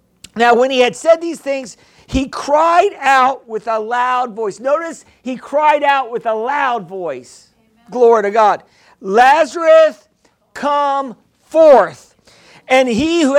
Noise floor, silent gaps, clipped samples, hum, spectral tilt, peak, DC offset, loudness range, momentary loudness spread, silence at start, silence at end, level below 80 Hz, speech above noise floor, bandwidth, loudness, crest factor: -58 dBFS; none; under 0.1%; none; -4 dB/octave; 0 dBFS; under 0.1%; 4 LU; 15 LU; 0.35 s; 0 s; -44 dBFS; 44 dB; 12.5 kHz; -14 LUFS; 14 dB